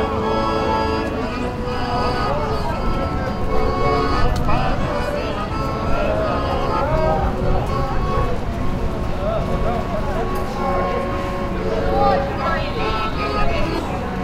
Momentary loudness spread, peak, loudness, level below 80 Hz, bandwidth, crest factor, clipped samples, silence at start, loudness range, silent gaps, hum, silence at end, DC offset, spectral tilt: 5 LU; -4 dBFS; -21 LUFS; -26 dBFS; 13.5 kHz; 16 dB; under 0.1%; 0 s; 2 LU; none; none; 0 s; under 0.1%; -7 dB/octave